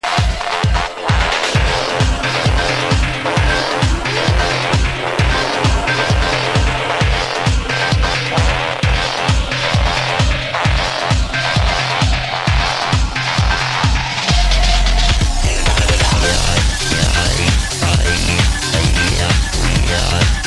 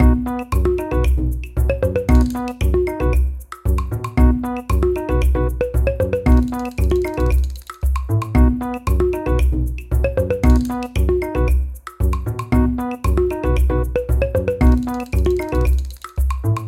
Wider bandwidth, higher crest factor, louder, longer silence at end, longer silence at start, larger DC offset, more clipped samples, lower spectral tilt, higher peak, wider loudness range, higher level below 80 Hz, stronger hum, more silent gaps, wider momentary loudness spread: second, 12.5 kHz vs 15 kHz; about the same, 12 dB vs 16 dB; first, -15 LUFS vs -19 LUFS; about the same, 0 s vs 0 s; about the same, 0.05 s vs 0 s; first, 0.4% vs under 0.1%; neither; second, -4 dB/octave vs -8 dB/octave; about the same, -2 dBFS vs -2 dBFS; about the same, 1 LU vs 1 LU; about the same, -18 dBFS vs -20 dBFS; neither; neither; second, 2 LU vs 6 LU